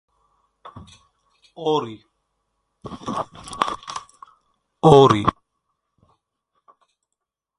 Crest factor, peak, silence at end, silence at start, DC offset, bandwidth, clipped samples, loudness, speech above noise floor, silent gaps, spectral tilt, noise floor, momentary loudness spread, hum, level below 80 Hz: 24 dB; 0 dBFS; 2.3 s; 0.75 s; under 0.1%; 11 kHz; under 0.1%; -19 LUFS; 64 dB; none; -6.5 dB/octave; -82 dBFS; 24 LU; none; -52 dBFS